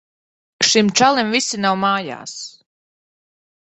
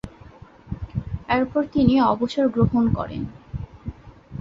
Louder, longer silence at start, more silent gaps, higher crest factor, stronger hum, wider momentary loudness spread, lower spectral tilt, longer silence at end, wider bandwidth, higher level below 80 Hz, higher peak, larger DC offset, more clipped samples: first, -16 LUFS vs -22 LUFS; first, 0.6 s vs 0.05 s; neither; about the same, 20 dB vs 20 dB; neither; about the same, 17 LU vs 19 LU; second, -2.5 dB/octave vs -8.5 dB/octave; first, 1.2 s vs 0 s; first, 8.4 kHz vs 7.6 kHz; second, -62 dBFS vs -40 dBFS; first, 0 dBFS vs -4 dBFS; neither; neither